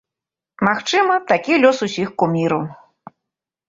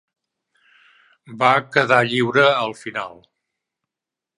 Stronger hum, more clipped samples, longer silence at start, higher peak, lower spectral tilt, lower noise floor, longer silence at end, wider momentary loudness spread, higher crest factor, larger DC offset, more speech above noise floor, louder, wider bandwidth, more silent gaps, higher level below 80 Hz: neither; neither; second, 0.6 s vs 1.3 s; about the same, -2 dBFS vs 0 dBFS; about the same, -5 dB/octave vs -5 dB/octave; about the same, -87 dBFS vs -87 dBFS; second, 0.95 s vs 1.25 s; second, 8 LU vs 13 LU; about the same, 18 dB vs 22 dB; neither; about the same, 70 dB vs 69 dB; about the same, -17 LUFS vs -18 LUFS; second, 7.8 kHz vs 11 kHz; neither; first, -60 dBFS vs -70 dBFS